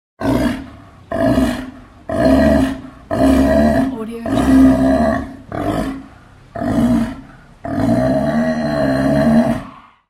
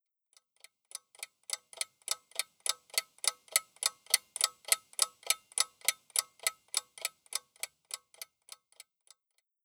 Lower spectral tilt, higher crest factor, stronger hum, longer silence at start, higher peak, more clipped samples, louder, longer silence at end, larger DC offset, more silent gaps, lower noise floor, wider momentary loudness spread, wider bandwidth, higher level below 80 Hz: first, -7.5 dB/octave vs 5 dB/octave; second, 16 dB vs 32 dB; neither; second, 0.2 s vs 0.95 s; first, 0 dBFS vs -6 dBFS; neither; first, -16 LUFS vs -33 LUFS; second, 0.3 s vs 1.4 s; neither; neither; second, -42 dBFS vs -80 dBFS; about the same, 16 LU vs 18 LU; second, 14.5 kHz vs over 20 kHz; first, -30 dBFS vs under -90 dBFS